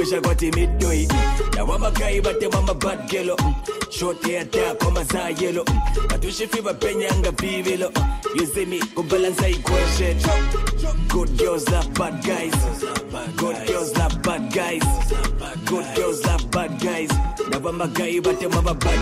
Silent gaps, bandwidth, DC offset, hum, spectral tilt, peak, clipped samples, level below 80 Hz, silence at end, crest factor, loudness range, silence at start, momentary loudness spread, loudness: none; 16 kHz; under 0.1%; none; -5 dB/octave; -8 dBFS; under 0.1%; -24 dBFS; 0 s; 12 dB; 2 LU; 0 s; 4 LU; -22 LUFS